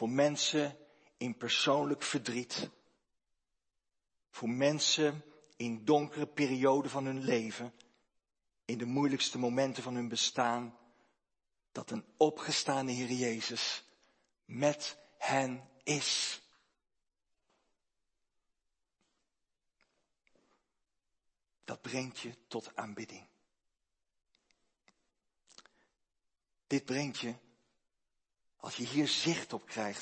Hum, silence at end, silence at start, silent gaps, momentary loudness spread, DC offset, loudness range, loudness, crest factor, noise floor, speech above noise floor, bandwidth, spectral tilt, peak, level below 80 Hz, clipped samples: none; 0 s; 0 s; none; 16 LU; under 0.1%; 12 LU; -34 LUFS; 24 dB; -87 dBFS; 53 dB; 8.8 kHz; -3.5 dB/octave; -14 dBFS; -84 dBFS; under 0.1%